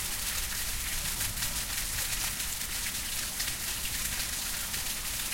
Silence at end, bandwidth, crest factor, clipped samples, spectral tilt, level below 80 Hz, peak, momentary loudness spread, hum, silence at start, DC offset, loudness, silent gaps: 0 s; 16.5 kHz; 16 dB; under 0.1%; -0.5 dB/octave; -44 dBFS; -16 dBFS; 1 LU; none; 0 s; under 0.1%; -31 LUFS; none